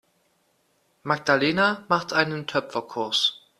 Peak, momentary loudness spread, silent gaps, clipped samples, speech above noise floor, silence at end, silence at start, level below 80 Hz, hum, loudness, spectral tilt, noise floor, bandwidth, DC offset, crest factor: -2 dBFS; 8 LU; none; under 0.1%; 44 dB; 0.25 s; 1.05 s; -66 dBFS; none; -23 LUFS; -4 dB/octave; -68 dBFS; 14 kHz; under 0.1%; 24 dB